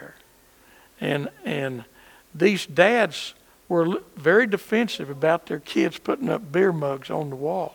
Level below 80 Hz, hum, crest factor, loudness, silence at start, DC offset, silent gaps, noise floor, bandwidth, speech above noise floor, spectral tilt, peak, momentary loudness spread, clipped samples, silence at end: -64 dBFS; none; 24 dB; -23 LUFS; 0 s; under 0.1%; none; -55 dBFS; 19.5 kHz; 32 dB; -5.5 dB/octave; 0 dBFS; 11 LU; under 0.1%; 0.05 s